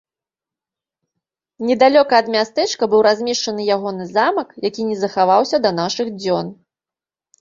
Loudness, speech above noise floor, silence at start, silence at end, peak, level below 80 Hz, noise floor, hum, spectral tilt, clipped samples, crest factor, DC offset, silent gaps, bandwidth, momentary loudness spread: -17 LUFS; 73 dB; 1.6 s; 0.9 s; -2 dBFS; -62 dBFS; -90 dBFS; none; -4 dB/octave; under 0.1%; 18 dB; under 0.1%; none; 7.6 kHz; 9 LU